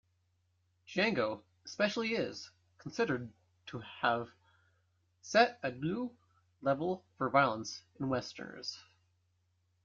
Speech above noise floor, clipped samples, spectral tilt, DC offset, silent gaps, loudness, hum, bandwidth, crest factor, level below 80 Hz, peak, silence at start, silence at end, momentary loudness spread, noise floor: 42 dB; under 0.1%; -5 dB/octave; under 0.1%; none; -34 LUFS; none; 7.6 kHz; 24 dB; -74 dBFS; -12 dBFS; 0.9 s; 1.05 s; 19 LU; -76 dBFS